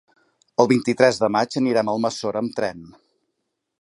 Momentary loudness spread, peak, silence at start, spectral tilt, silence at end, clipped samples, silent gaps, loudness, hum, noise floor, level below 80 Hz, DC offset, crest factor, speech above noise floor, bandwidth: 9 LU; 0 dBFS; 0.6 s; -5 dB/octave; 0.9 s; under 0.1%; none; -21 LUFS; none; -77 dBFS; -64 dBFS; under 0.1%; 22 dB; 56 dB; 11.5 kHz